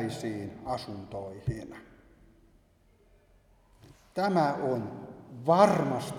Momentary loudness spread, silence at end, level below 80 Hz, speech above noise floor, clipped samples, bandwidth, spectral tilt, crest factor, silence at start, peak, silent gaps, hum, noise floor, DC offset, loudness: 20 LU; 0 s; -58 dBFS; 35 dB; under 0.1%; 15.5 kHz; -6.5 dB/octave; 24 dB; 0 s; -8 dBFS; none; none; -64 dBFS; under 0.1%; -29 LUFS